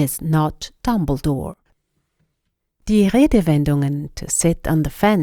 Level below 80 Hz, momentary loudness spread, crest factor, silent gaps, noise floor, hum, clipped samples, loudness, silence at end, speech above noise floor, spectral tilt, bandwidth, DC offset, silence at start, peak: -34 dBFS; 11 LU; 18 dB; none; -74 dBFS; none; under 0.1%; -19 LUFS; 0 s; 56 dB; -6 dB/octave; over 20 kHz; under 0.1%; 0 s; -2 dBFS